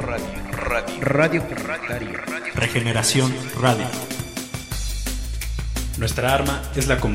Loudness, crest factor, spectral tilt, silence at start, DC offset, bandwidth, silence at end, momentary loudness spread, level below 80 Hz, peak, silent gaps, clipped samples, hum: -23 LUFS; 20 dB; -4.5 dB/octave; 0 s; under 0.1%; 16.5 kHz; 0 s; 10 LU; -32 dBFS; -2 dBFS; none; under 0.1%; none